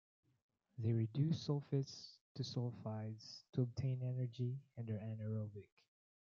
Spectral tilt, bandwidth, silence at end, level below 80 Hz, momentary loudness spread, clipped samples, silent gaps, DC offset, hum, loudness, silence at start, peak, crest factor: -7.5 dB/octave; 7.2 kHz; 0.65 s; -80 dBFS; 12 LU; under 0.1%; 2.21-2.35 s, 3.49-3.53 s; under 0.1%; none; -43 LUFS; 0.75 s; -26 dBFS; 18 dB